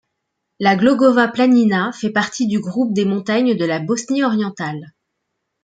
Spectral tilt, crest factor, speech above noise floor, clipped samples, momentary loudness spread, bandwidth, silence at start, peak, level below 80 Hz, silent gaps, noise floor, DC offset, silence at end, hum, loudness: -5.5 dB/octave; 16 dB; 59 dB; under 0.1%; 8 LU; 9.2 kHz; 0.6 s; -2 dBFS; -62 dBFS; none; -75 dBFS; under 0.1%; 0.75 s; none; -17 LUFS